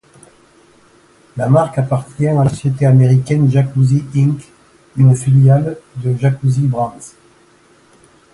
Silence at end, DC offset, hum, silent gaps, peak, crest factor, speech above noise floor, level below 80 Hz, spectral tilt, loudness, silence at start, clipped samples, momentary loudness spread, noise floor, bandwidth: 1.25 s; under 0.1%; none; none; 0 dBFS; 14 dB; 37 dB; -48 dBFS; -8.5 dB/octave; -14 LUFS; 1.35 s; under 0.1%; 12 LU; -49 dBFS; 11.5 kHz